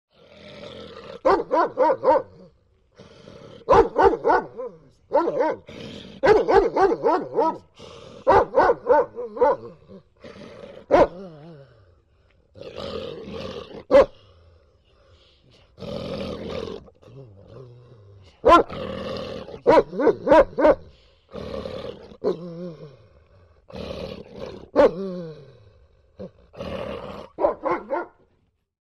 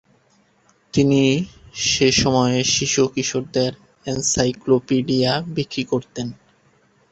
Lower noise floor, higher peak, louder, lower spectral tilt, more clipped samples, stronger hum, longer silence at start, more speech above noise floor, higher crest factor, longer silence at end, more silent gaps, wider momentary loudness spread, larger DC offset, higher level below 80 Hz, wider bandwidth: first, -67 dBFS vs -59 dBFS; about the same, -2 dBFS vs -4 dBFS; about the same, -21 LUFS vs -19 LUFS; first, -6.5 dB/octave vs -4 dB/octave; neither; neither; second, 0.45 s vs 0.95 s; first, 48 dB vs 40 dB; about the same, 22 dB vs 18 dB; about the same, 0.75 s vs 0.8 s; neither; first, 23 LU vs 10 LU; neither; about the same, -46 dBFS vs -48 dBFS; about the same, 8.6 kHz vs 8.2 kHz